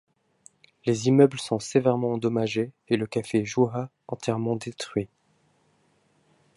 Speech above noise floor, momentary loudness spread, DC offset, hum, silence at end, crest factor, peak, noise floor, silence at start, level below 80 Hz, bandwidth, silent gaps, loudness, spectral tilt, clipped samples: 41 dB; 12 LU; under 0.1%; none; 1.5 s; 20 dB; -6 dBFS; -66 dBFS; 0.85 s; -64 dBFS; 11.5 kHz; none; -26 LUFS; -6 dB/octave; under 0.1%